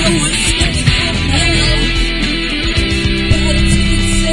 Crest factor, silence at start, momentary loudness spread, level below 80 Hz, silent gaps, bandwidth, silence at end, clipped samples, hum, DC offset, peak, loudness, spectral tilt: 12 dB; 0 s; 3 LU; -18 dBFS; none; 11.5 kHz; 0 s; under 0.1%; none; 1%; 0 dBFS; -13 LUFS; -4 dB/octave